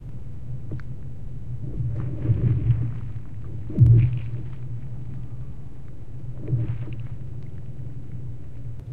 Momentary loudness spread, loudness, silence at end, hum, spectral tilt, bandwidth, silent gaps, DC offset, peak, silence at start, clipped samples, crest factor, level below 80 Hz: 18 LU; -26 LUFS; 0 s; none; -11 dB/octave; 3.1 kHz; none; 3%; -6 dBFS; 0 s; under 0.1%; 22 dB; -38 dBFS